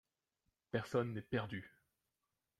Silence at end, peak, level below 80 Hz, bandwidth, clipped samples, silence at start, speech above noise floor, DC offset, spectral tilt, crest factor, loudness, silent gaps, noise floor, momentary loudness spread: 0.9 s; -22 dBFS; -74 dBFS; 13.5 kHz; under 0.1%; 0.75 s; 49 dB; under 0.1%; -7 dB/octave; 22 dB; -42 LUFS; none; -89 dBFS; 10 LU